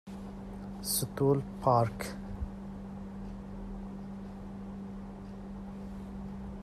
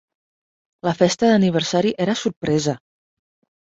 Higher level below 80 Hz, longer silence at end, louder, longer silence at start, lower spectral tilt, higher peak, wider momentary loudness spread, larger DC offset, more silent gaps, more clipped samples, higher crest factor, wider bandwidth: first, -48 dBFS vs -58 dBFS; second, 0 s vs 0.85 s; second, -36 LUFS vs -19 LUFS; second, 0.05 s vs 0.85 s; about the same, -5.5 dB/octave vs -5.5 dB/octave; second, -14 dBFS vs -2 dBFS; first, 15 LU vs 10 LU; neither; second, none vs 2.36-2.41 s; neither; about the same, 22 dB vs 18 dB; first, 15 kHz vs 8 kHz